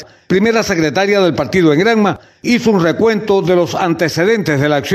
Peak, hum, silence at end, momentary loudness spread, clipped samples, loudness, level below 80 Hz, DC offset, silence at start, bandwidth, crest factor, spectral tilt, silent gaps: 0 dBFS; none; 0 s; 4 LU; under 0.1%; -13 LUFS; -46 dBFS; under 0.1%; 0 s; 14 kHz; 12 dB; -5.5 dB/octave; none